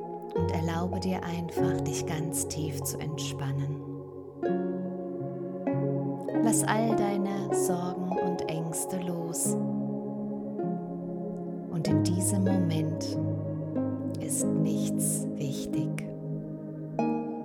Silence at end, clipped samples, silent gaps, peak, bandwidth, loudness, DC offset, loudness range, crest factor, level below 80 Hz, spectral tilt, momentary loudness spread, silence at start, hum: 0 s; under 0.1%; none; -12 dBFS; 19 kHz; -30 LUFS; under 0.1%; 4 LU; 18 dB; -60 dBFS; -5.5 dB/octave; 9 LU; 0 s; none